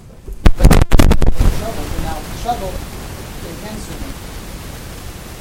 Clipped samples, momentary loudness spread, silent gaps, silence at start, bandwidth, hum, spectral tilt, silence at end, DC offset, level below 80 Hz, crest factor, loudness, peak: 0.5%; 18 LU; none; 0.25 s; 16.5 kHz; none; -5.5 dB/octave; 0 s; under 0.1%; -16 dBFS; 14 dB; -18 LUFS; 0 dBFS